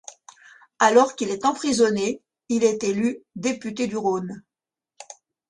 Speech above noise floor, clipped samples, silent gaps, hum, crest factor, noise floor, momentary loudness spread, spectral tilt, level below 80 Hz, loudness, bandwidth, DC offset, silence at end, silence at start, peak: 66 dB; under 0.1%; none; none; 20 dB; -88 dBFS; 23 LU; -4 dB/octave; -64 dBFS; -22 LUFS; 11 kHz; under 0.1%; 0.35 s; 0.1 s; -4 dBFS